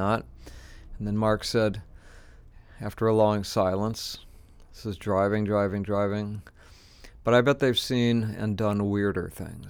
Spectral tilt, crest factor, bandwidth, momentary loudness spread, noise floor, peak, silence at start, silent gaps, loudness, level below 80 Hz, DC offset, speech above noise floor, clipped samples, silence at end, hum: -6 dB/octave; 18 dB; 19.5 kHz; 15 LU; -52 dBFS; -8 dBFS; 0 s; none; -26 LUFS; -50 dBFS; under 0.1%; 26 dB; under 0.1%; 0 s; none